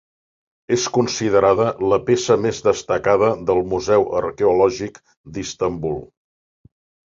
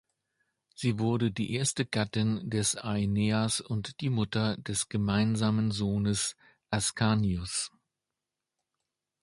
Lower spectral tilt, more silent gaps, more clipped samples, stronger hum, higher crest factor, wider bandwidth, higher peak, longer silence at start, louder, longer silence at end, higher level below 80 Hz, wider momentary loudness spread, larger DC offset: about the same, -5 dB/octave vs -4.5 dB/octave; first, 5.17-5.24 s vs none; neither; neither; about the same, 18 dB vs 18 dB; second, 7.8 kHz vs 11.5 kHz; first, -2 dBFS vs -12 dBFS; about the same, 0.7 s vs 0.8 s; first, -19 LUFS vs -30 LUFS; second, 1.05 s vs 1.55 s; first, -48 dBFS vs -54 dBFS; first, 12 LU vs 6 LU; neither